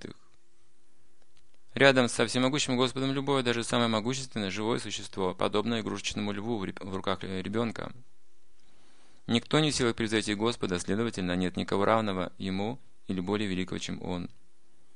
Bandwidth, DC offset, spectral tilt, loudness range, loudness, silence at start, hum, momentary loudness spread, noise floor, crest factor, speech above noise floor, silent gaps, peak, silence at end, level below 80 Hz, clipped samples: 10.5 kHz; 0.7%; -4.5 dB/octave; 6 LU; -29 LUFS; 0 s; none; 10 LU; -69 dBFS; 26 dB; 39 dB; none; -6 dBFS; 0.7 s; -60 dBFS; under 0.1%